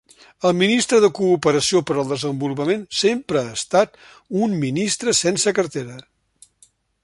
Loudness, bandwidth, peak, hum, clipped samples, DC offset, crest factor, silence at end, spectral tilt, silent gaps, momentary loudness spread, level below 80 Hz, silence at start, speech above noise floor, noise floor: -19 LUFS; 11.5 kHz; -2 dBFS; none; under 0.1%; under 0.1%; 18 dB; 1.05 s; -4 dB/octave; none; 8 LU; -58 dBFS; 0.4 s; 38 dB; -57 dBFS